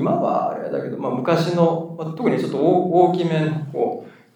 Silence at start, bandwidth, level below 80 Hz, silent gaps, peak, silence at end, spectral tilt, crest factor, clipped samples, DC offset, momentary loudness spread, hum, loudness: 0 s; 10.5 kHz; -80 dBFS; none; -2 dBFS; 0.25 s; -8 dB/octave; 18 dB; under 0.1%; under 0.1%; 9 LU; none; -20 LUFS